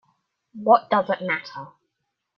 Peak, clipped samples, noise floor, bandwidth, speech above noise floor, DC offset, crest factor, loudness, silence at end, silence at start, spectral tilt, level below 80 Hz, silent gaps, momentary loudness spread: -2 dBFS; under 0.1%; -79 dBFS; 6.2 kHz; 58 dB; under 0.1%; 22 dB; -21 LUFS; 0.7 s; 0.55 s; -7 dB/octave; -72 dBFS; none; 18 LU